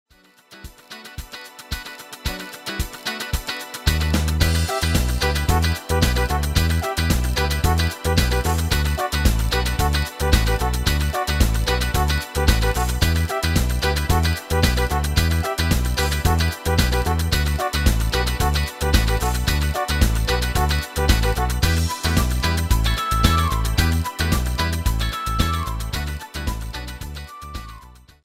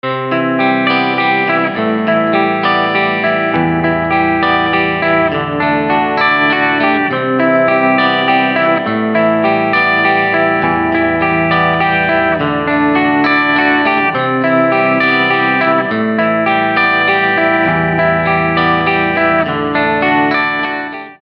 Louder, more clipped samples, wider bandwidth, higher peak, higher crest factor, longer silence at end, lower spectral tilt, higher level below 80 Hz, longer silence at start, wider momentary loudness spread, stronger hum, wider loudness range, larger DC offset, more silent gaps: second, -21 LUFS vs -12 LUFS; neither; first, 16 kHz vs 6 kHz; about the same, 0 dBFS vs 0 dBFS; first, 20 dB vs 12 dB; first, 0.35 s vs 0.05 s; second, -4.5 dB/octave vs -8 dB/octave; first, -24 dBFS vs -44 dBFS; first, 0.5 s vs 0.05 s; first, 11 LU vs 3 LU; neither; first, 4 LU vs 1 LU; neither; neither